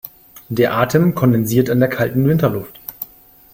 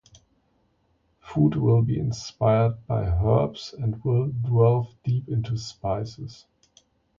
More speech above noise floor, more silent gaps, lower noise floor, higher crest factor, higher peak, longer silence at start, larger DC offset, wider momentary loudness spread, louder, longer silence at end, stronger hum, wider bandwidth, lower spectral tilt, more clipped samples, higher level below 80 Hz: second, 30 dB vs 44 dB; neither; second, -45 dBFS vs -68 dBFS; about the same, 16 dB vs 18 dB; first, -2 dBFS vs -8 dBFS; second, 0.05 s vs 1.25 s; neither; first, 17 LU vs 10 LU; first, -16 LUFS vs -24 LUFS; second, 0.5 s vs 0.85 s; neither; first, 17 kHz vs 7.4 kHz; about the same, -7 dB/octave vs -8 dB/octave; neither; second, -48 dBFS vs -42 dBFS